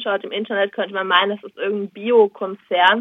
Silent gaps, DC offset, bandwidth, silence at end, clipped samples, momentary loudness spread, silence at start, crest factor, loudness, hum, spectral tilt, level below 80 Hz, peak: none; under 0.1%; 5.6 kHz; 0 s; under 0.1%; 9 LU; 0 s; 18 dB; -19 LUFS; none; -6 dB/octave; -82 dBFS; -2 dBFS